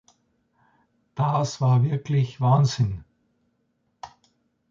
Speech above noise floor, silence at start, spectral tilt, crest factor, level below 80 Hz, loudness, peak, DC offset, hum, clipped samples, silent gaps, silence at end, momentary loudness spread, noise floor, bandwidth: 50 dB; 1.15 s; -7 dB/octave; 18 dB; -54 dBFS; -23 LUFS; -8 dBFS; under 0.1%; none; under 0.1%; none; 0.65 s; 24 LU; -71 dBFS; 7.4 kHz